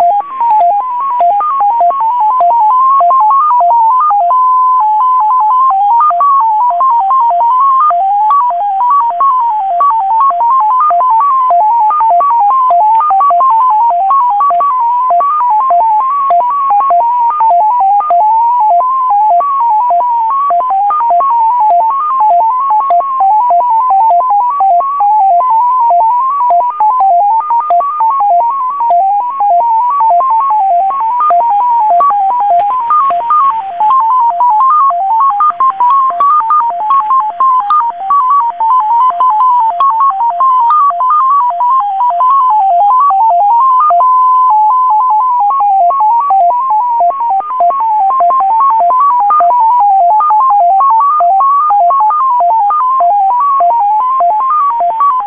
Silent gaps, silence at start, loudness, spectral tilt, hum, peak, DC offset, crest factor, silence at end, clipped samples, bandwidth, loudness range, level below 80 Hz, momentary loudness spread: none; 0 s; -8 LUFS; -5.5 dB/octave; none; -2 dBFS; 0.5%; 6 dB; 0 s; under 0.1%; 4 kHz; 2 LU; -62 dBFS; 3 LU